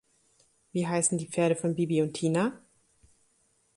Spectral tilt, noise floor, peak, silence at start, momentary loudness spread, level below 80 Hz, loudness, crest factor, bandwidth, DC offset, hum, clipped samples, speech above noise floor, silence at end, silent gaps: -5 dB/octave; -70 dBFS; -12 dBFS; 0.75 s; 6 LU; -70 dBFS; -28 LUFS; 20 dB; 11.5 kHz; under 0.1%; none; under 0.1%; 42 dB; 1.2 s; none